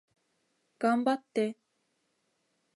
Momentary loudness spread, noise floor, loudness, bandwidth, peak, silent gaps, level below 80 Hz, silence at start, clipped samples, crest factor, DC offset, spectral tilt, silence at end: 5 LU; -77 dBFS; -31 LUFS; 11.5 kHz; -14 dBFS; none; -84 dBFS; 0.8 s; under 0.1%; 20 dB; under 0.1%; -5.5 dB/octave; 1.25 s